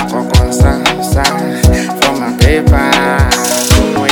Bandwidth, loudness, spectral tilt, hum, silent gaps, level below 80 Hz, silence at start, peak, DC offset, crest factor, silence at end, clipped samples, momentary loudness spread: 18.5 kHz; -10 LUFS; -4.5 dB/octave; none; none; -16 dBFS; 0 s; 0 dBFS; under 0.1%; 10 dB; 0 s; 1%; 3 LU